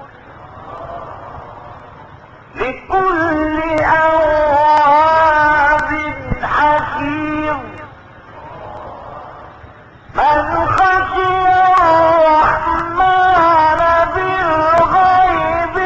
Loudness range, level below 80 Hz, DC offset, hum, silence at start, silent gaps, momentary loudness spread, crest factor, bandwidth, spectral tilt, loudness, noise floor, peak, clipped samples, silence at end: 10 LU; -36 dBFS; under 0.1%; none; 0 s; none; 21 LU; 12 dB; 8.2 kHz; -6 dB/octave; -13 LUFS; -39 dBFS; -2 dBFS; under 0.1%; 0 s